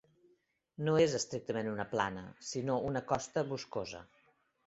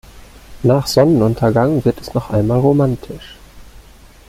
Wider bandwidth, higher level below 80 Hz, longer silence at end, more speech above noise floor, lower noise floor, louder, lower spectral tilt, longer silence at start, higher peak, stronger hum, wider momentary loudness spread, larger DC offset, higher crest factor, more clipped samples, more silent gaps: second, 8 kHz vs 16 kHz; second, -66 dBFS vs -40 dBFS; first, 0.65 s vs 0.5 s; first, 39 dB vs 27 dB; first, -74 dBFS vs -41 dBFS; second, -35 LUFS vs -15 LUFS; second, -5 dB/octave vs -7 dB/octave; first, 0.8 s vs 0.15 s; second, -16 dBFS vs -2 dBFS; neither; about the same, 13 LU vs 11 LU; neither; first, 20 dB vs 14 dB; neither; neither